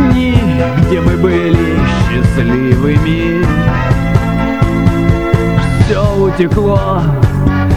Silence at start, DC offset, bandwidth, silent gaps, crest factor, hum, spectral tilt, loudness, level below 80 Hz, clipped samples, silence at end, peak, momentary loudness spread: 0 s; 2%; 14.5 kHz; none; 10 dB; none; -8 dB/octave; -11 LUFS; -20 dBFS; 0.3%; 0 s; 0 dBFS; 2 LU